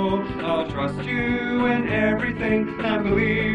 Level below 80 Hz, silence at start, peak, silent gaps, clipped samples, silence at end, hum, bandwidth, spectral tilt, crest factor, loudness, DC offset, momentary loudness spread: -42 dBFS; 0 s; -8 dBFS; none; under 0.1%; 0 s; none; 9.6 kHz; -8 dB/octave; 14 dB; -23 LUFS; under 0.1%; 4 LU